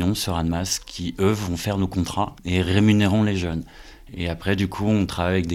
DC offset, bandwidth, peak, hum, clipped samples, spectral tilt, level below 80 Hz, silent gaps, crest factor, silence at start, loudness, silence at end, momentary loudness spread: under 0.1%; 16 kHz; -4 dBFS; none; under 0.1%; -5.5 dB/octave; -40 dBFS; none; 18 dB; 0 s; -23 LUFS; 0 s; 11 LU